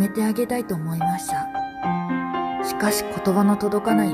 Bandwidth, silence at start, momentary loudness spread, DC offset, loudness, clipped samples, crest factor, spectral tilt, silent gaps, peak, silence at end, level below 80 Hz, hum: 14.5 kHz; 0 s; 6 LU; under 0.1%; -23 LUFS; under 0.1%; 16 dB; -5.5 dB/octave; none; -6 dBFS; 0 s; -54 dBFS; none